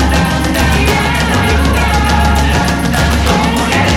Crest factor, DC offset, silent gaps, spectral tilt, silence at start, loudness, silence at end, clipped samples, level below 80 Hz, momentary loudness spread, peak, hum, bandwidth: 10 dB; under 0.1%; none; -5 dB/octave; 0 s; -11 LUFS; 0 s; under 0.1%; -16 dBFS; 2 LU; 0 dBFS; none; 17 kHz